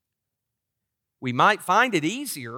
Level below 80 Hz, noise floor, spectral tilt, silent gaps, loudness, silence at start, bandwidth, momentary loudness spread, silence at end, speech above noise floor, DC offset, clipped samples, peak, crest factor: -76 dBFS; -83 dBFS; -4 dB/octave; none; -22 LUFS; 1.2 s; 18 kHz; 11 LU; 0 s; 61 dB; under 0.1%; under 0.1%; -6 dBFS; 20 dB